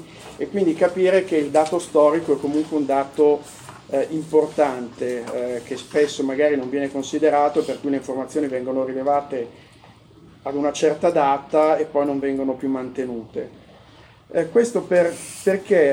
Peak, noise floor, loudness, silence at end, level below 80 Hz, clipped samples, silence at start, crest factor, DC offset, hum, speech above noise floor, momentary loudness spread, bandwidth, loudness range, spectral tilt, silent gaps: -4 dBFS; -48 dBFS; -21 LUFS; 0 s; -60 dBFS; under 0.1%; 0 s; 16 dB; under 0.1%; none; 28 dB; 11 LU; 16.5 kHz; 4 LU; -5.5 dB/octave; none